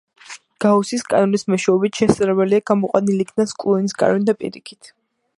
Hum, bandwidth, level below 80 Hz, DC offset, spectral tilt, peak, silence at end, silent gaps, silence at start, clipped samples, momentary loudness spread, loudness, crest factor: none; 11.5 kHz; -56 dBFS; under 0.1%; -6 dB/octave; 0 dBFS; 0.7 s; none; 0.3 s; under 0.1%; 11 LU; -18 LUFS; 18 dB